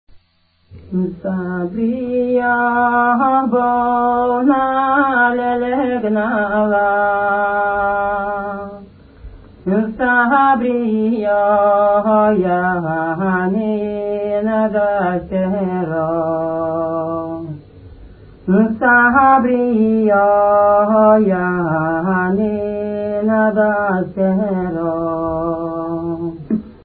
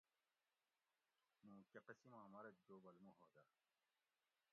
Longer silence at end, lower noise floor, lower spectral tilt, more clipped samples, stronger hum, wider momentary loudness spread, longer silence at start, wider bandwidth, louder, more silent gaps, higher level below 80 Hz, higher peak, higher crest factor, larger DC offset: second, 0.1 s vs 1.05 s; second, -58 dBFS vs under -90 dBFS; first, -12.5 dB/octave vs -5.5 dB/octave; neither; neither; first, 10 LU vs 6 LU; second, 0.15 s vs 1.4 s; about the same, 4.4 kHz vs 4.3 kHz; first, -16 LUFS vs -65 LUFS; neither; first, -46 dBFS vs under -90 dBFS; first, 0 dBFS vs -46 dBFS; second, 14 dB vs 22 dB; neither